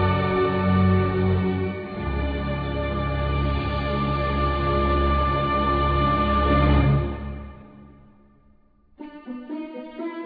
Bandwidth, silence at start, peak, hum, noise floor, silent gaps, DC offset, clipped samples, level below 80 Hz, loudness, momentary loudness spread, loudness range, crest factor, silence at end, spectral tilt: 5 kHz; 0 s; -8 dBFS; none; -57 dBFS; none; under 0.1%; under 0.1%; -30 dBFS; -23 LUFS; 15 LU; 5 LU; 16 dB; 0 s; -10 dB/octave